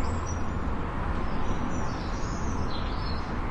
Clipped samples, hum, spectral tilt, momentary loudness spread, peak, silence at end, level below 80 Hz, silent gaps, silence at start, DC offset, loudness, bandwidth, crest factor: under 0.1%; none; -6 dB/octave; 1 LU; -16 dBFS; 0 s; -34 dBFS; none; 0 s; under 0.1%; -32 LUFS; 8.2 kHz; 12 dB